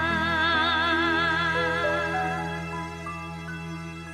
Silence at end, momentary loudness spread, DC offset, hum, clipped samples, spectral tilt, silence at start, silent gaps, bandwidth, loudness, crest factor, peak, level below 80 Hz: 0 s; 13 LU; under 0.1%; none; under 0.1%; -4.5 dB/octave; 0 s; none; 14 kHz; -25 LUFS; 14 dB; -12 dBFS; -48 dBFS